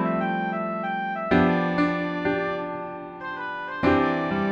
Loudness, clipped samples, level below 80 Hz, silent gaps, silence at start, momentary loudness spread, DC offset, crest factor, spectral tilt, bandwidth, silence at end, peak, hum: -25 LUFS; under 0.1%; -52 dBFS; none; 0 s; 11 LU; under 0.1%; 18 dB; -8 dB/octave; 7 kHz; 0 s; -6 dBFS; none